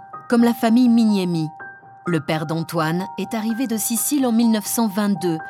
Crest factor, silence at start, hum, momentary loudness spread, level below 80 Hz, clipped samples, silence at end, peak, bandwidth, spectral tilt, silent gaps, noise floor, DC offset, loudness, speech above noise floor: 14 dB; 0 s; none; 9 LU; -70 dBFS; under 0.1%; 0 s; -4 dBFS; 16.5 kHz; -5 dB/octave; none; -39 dBFS; under 0.1%; -20 LUFS; 20 dB